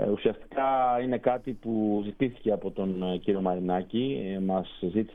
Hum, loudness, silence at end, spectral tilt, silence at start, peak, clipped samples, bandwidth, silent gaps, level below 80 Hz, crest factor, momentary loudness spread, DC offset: none; -29 LUFS; 0 s; -9.5 dB/octave; 0 s; -10 dBFS; under 0.1%; 3.9 kHz; none; -54 dBFS; 18 dB; 5 LU; under 0.1%